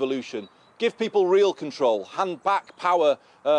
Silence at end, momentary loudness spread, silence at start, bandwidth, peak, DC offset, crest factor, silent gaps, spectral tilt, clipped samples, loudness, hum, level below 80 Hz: 0 s; 8 LU; 0 s; 9.8 kHz; -8 dBFS; under 0.1%; 14 dB; none; -4.5 dB/octave; under 0.1%; -24 LUFS; none; -76 dBFS